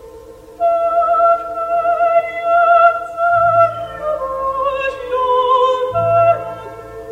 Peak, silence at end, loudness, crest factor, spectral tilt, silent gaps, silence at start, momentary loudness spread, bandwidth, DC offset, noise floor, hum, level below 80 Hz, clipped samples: 0 dBFS; 0 s; -15 LUFS; 14 dB; -5.5 dB/octave; none; 0 s; 10 LU; 8.2 kHz; under 0.1%; -37 dBFS; none; -48 dBFS; under 0.1%